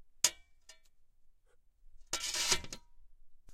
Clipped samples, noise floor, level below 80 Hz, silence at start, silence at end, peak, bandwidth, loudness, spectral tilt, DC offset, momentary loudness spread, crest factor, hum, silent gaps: under 0.1%; -65 dBFS; -56 dBFS; 0 s; 0 s; -10 dBFS; 16 kHz; -33 LUFS; 0.5 dB/octave; under 0.1%; 16 LU; 30 dB; none; none